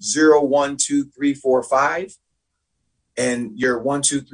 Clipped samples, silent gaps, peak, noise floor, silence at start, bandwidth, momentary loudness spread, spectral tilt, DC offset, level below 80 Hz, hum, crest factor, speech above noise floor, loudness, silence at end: under 0.1%; none; -2 dBFS; -74 dBFS; 0 s; 10.5 kHz; 9 LU; -3 dB/octave; under 0.1%; -60 dBFS; none; 16 dB; 56 dB; -19 LUFS; 0.1 s